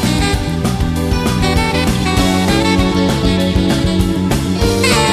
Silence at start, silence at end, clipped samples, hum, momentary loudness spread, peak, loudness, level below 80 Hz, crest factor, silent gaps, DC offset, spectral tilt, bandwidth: 0 s; 0 s; under 0.1%; none; 4 LU; 0 dBFS; -14 LUFS; -22 dBFS; 14 dB; none; under 0.1%; -5 dB/octave; 14 kHz